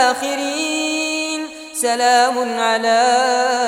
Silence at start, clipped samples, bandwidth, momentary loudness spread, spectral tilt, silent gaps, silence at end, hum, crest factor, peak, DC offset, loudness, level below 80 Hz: 0 s; under 0.1%; 16.5 kHz; 7 LU; -0.5 dB/octave; none; 0 s; none; 14 dB; -2 dBFS; under 0.1%; -17 LUFS; -68 dBFS